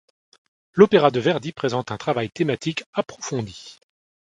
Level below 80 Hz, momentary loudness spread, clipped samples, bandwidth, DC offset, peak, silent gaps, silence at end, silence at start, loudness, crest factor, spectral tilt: -60 dBFS; 14 LU; under 0.1%; 9.2 kHz; under 0.1%; 0 dBFS; 2.86-2.93 s; 0.55 s; 0.75 s; -22 LUFS; 22 dB; -5.5 dB/octave